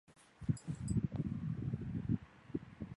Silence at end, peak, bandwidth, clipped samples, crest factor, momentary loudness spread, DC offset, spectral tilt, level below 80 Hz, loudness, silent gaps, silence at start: 0 s; -20 dBFS; 11.5 kHz; under 0.1%; 20 dB; 8 LU; under 0.1%; -8 dB/octave; -54 dBFS; -41 LUFS; none; 0.1 s